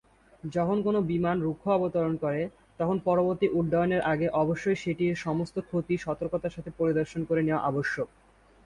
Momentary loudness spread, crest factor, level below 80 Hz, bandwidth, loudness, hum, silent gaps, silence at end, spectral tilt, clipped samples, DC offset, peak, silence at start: 7 LU; 16 dB; -56 dBFS; 10.5 kHz; -28 LUFS; none; none; 0.6 s; -8 dB/octave; under 0.1%; under 0.1%; -12 dBFS; 0.45 s